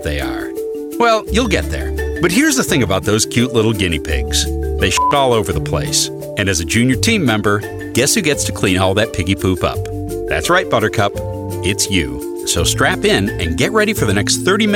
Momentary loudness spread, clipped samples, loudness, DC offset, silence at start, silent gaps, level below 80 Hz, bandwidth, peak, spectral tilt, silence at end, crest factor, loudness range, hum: 8 LU; under 0.1%; -15 LUFS; under 0.1%; 0 s; none; -28 dBFS; 18 kHz; 0 dBFS; -4 dB/octave; 0 s; 14 dB; 2 LU; none